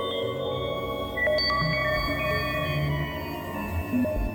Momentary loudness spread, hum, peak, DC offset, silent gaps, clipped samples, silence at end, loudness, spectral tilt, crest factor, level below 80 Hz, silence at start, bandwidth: 8 LU; none; -14 dBFS; under 0.1%; none; under 0.1%; 0 s; -27 LUFS; -6 dB/octave; 14 dB; -38 dBFS; 0 s; over 20 kHz